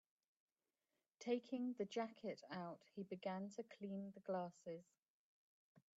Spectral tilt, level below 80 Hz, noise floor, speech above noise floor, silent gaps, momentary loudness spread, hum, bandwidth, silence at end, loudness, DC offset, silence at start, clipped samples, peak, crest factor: -5.5 dB/octave; under -90 dBFS; under -90 dBFS; over 42 dB; 4.99-5.03 s, 5.10-5.75 s; 9 LU; none; 7.6 kHz; 0.2 s; -49 LUFS; under 0.1%; 1.2 s; under 0.1%; -30 dBFS; 20 dB